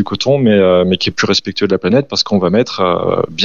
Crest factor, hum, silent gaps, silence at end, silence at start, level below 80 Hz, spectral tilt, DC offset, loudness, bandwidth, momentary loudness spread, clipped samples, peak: 12 dB; none; none; 0 s; 0 s; -54 dBFS; -5.5 dB/octave; 0.7%; -13 LUFS; 7.4 kHz; 5 LU; under 0.1%; 0 dBFS